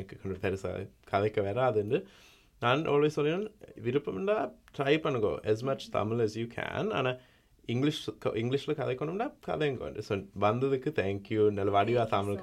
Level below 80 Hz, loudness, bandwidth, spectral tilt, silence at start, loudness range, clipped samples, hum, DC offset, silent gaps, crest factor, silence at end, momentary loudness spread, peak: -62 dBFS; -31 LUFS; 13 kHz; -6.5 dB/octave; 0 s; 3 LU; under 0.1%; none; under 0.1%; none; 18 dB; 0 s; 9 LU; -12 dBFS